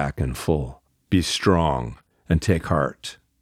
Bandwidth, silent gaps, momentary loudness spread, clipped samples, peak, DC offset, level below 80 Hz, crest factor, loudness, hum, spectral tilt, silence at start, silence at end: 15.5 kHz; none; 16 LU; under 0.1%; -4 dBFS; under 0.1%; -36 dBFS; 20 dB; -23 LUFS; none; -5.5 dB/octave; 0 s; 0.3 s